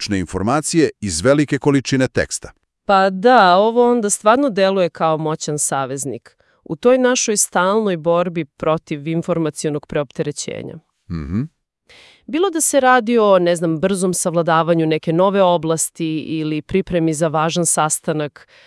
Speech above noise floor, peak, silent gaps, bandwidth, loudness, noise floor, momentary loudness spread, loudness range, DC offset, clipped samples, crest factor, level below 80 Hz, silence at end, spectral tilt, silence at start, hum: 33 dB; 0 dBFS; none; 12 kHz; -17 LUFS; -50 dBFS; 11 LU; 7 LU; under 0.1%; under 0.1%; 18 dB; -48 dBFS; 0.35 s; -4.5 dB/octave; 0 s; none